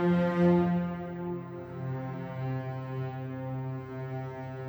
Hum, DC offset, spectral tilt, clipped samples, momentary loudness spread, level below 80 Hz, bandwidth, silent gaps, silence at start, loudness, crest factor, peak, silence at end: none; under 0.1%; -10 dB/octave; under 0.1%; 13 LU; -62 dBFS; over 20 kHz; none; 0 s; -32 LUFS; 16 dB; -14 dBFS; 0 s